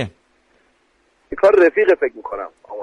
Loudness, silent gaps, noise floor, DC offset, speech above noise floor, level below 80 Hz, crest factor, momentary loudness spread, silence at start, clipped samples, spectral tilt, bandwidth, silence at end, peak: -15 LUFS; none; -61 dBFS; under 0.1%; 45 dB; -52 dBFS; 16 dB; 19 LU; 0 s; under 0.1%; -7 dB/octave; 8.6 kHz; 0 s; -4 dBFS